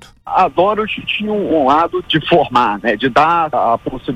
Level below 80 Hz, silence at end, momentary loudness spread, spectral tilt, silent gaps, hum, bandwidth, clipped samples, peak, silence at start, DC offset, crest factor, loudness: -44 dBFS; 0 s; 6 LU; -6 dB/octave; none; none; 11 kHz; under 0.1%; -2 dBFS; 0.25 s; under 0.1%; 14 dB; -14 LUFS